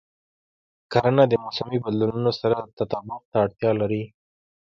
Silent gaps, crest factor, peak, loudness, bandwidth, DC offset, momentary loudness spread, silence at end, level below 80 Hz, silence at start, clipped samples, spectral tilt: 2.73-2.77 s, 3.25-3.32 s; 22 dB; -4 dBFS; -23 LUFS; 7.4 kHz; under 0.1%; 10 LU; 0.6 s; -58 dBFS; 0.9 s; under 0.1%; -8 dB/octave